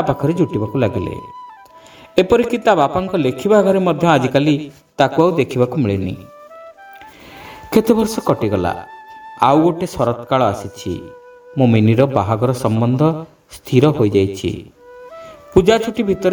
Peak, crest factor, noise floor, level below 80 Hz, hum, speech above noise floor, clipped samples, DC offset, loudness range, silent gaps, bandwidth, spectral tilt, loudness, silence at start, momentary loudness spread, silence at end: 0 dBFS; 16 dB; -42 dBFS; -44 dBFS; none; 27 dB; under 0.1%; under 0.1%; 4 LU; none; over 20 kHz; -7 dB/octave; -16 LUFS; 0 s; 20 LU; 0 s